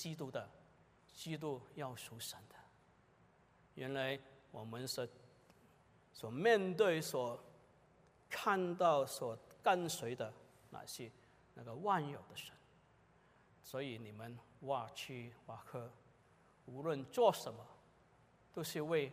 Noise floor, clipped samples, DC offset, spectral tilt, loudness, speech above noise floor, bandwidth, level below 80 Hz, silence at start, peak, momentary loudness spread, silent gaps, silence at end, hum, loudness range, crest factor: -70 dBFS; under 0.1%; under 0.1%; -4.5 dB/octave; -40 LUFS; 30 dB; 15.5 kHz; -80 dBFS; 0 s; -18 dBFS; 21 LU; none; 0 s; none; 10 LU; 24 dB